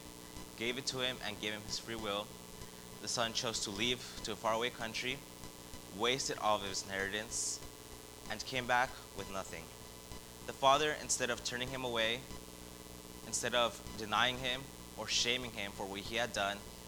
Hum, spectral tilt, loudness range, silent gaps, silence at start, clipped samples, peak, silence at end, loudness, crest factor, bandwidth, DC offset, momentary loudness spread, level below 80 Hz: 60 Hz at -60 dBFS; -2 dB/octave; 3 LU; none; 0 s; under 0.1%; -16 dBFS; 0 s; -36 LUFS; 24 dB; over 20 kHz; under 0.1%; 17 LU; -58 dBFS